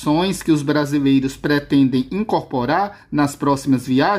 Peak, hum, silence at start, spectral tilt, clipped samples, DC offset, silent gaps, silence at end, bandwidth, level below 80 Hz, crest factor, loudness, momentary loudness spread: -6 dBFS; none; 0 s; -6 dB/octave; under 0.1%; under 0.1%; none; 0 s; 15.5 kHz; -48 dBFS; 12 dB; -18 LUFS; 4 LU